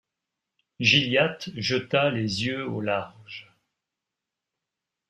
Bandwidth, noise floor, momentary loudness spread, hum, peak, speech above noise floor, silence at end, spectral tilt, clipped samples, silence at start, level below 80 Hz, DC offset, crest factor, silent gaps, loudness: 12.5 kHz; -87 dBFS; 20 LU; none; -6 dBFS; 61 dB; 1.7 s; -4.5 dB/octave; under 0.1%; 0.8 s; -64 dBFS; under 0.1%; 22 dB; none; -24 LUFS